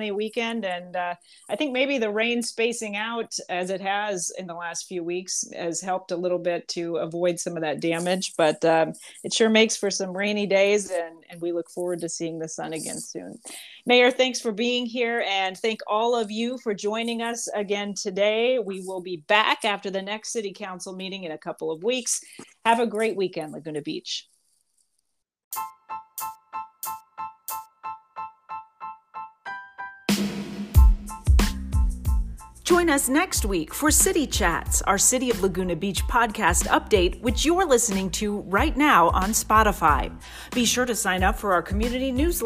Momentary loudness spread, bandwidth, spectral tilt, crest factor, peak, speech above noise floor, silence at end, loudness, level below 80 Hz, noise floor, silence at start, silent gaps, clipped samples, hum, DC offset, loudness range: 16 LU; 16 kHz; -3.5 dB/octave; 22 dB; -4 dBFS; 52 dB; 0 s; -24 LUFS; -32 dBFS; -76 dBFS; 0 s; 25.44-25.51 s; under 0.1%; none; under 0.1%; 13 LU